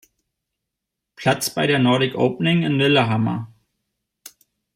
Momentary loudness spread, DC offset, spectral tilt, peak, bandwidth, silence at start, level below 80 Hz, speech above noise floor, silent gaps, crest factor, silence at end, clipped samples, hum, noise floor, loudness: 8 LU; under 0.1%; -5.5 dB/octave; -6 dBFS; 16 kHz; 1.2 s; -62 dBFS; 64 dB; none; 16 dB; 0.45 s; under 0.1%; none; -82 dBFS; -19 LUFS